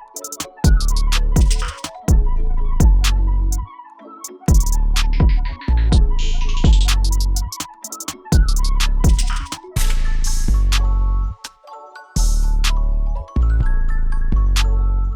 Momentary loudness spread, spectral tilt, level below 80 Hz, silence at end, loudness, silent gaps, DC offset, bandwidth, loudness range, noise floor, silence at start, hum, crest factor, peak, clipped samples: 11 LU; -4.5 dB/octave; -16 dBFS; 0 s; -20 LUFS; none; under 0.1%; 16.5 kHz; 3 LU; -39 dBFS; 0 s; none; 14 dB; -2 dBFS; under 0.1%